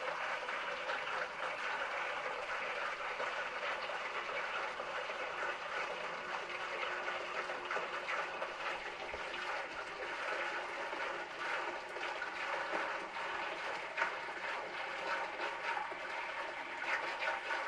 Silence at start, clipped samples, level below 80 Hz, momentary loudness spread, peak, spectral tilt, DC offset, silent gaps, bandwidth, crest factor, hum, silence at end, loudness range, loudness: 0 s; under 0.1%; -74 dBFS; 3 LU; -20 dBFS; -2 dB/octave; under 0.1%; none; 12 kHz; 20 dB; none; 0 s; 1 LU; -39 LUFS